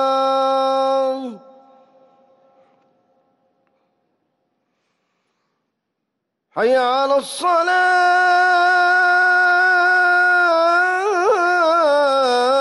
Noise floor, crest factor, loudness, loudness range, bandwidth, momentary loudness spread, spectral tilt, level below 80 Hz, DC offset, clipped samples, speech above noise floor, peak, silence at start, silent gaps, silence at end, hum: -77 dBFS; 10 dB; -15 LUFS; 12 LU; 12 kHz; 5 LU; -2 dB/octave; -70 dBFS; under 0.1%; under 0.1%; 61 dB; -8 dBFS; 0 s; none; 0 s; none